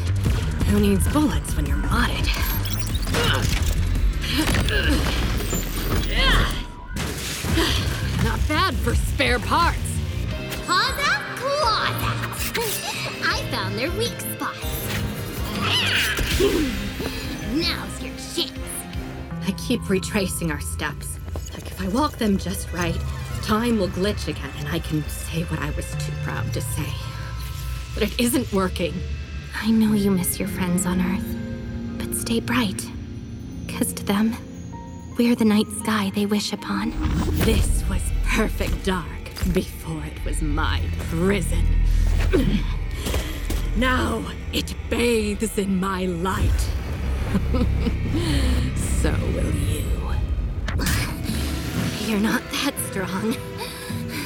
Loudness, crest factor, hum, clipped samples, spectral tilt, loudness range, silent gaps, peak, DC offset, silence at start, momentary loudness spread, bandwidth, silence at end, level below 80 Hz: -24 LUFS; 18 dB; none; under 0.1%; -4.5 dB/octave; 4 LU; none; -4 dBFS; under 0.1%; 0 s; 10 LU; over 20 kHz; 0 s; -28 dBFS